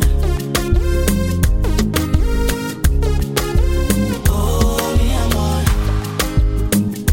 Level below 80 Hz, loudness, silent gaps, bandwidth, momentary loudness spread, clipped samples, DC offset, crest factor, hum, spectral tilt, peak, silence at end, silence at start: -18 dBFS; -18 LUFS; none; 17 kHz; 3 LU; under 0.1%; under 0.1%; 14 dB; none; -5.5 dB/octave; 0 dBFS; 0 s; 0 s